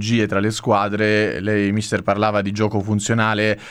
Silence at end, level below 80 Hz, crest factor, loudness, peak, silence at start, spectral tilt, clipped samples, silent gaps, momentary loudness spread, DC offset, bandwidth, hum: 0 s; -54 dBFS; 14 dB; -19 LUFS; -4 dBFS; 0 s; -5.5 dB/octave; under 0.1%; none; 3 LU; under 0.1%; 12.5 kHz; none